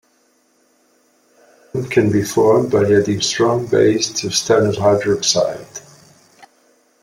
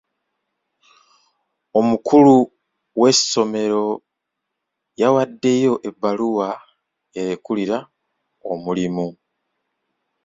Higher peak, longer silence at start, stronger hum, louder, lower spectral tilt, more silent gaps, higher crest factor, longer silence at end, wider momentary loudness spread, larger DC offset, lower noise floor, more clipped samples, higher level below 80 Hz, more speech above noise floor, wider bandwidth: about the same, 0 dBFS vs -2 dBFS; about the same, 1.75 s vs 1.75 s; neither; about the same, -16 LUFS vs -18 LUFS; about the same, -4.5 dB/octave vs -4.5 dB/octave; neither; about the same, 18 dB vs 18 dB; about the same, 1.25 s vs 1.15 s; second, 11 LU vs 16 LU; neither; second, -59 dBFS vs -79 dBFS; neither; first, -54 dBFS vs -62 dBFS; second, 44 dB vs 62 dB; first, 16 kHz vs 7.8 kHz